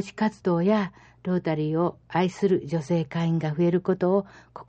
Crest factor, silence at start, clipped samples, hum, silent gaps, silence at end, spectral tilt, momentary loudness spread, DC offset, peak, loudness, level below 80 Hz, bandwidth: 16 dB; 0 s; under 0.1%; none; none; 0.05 s; -8 dB/octave; 5 LU; under 0.1%; -10 dBFS; -25 LUFS; -60 dBFS; 8.4 kHz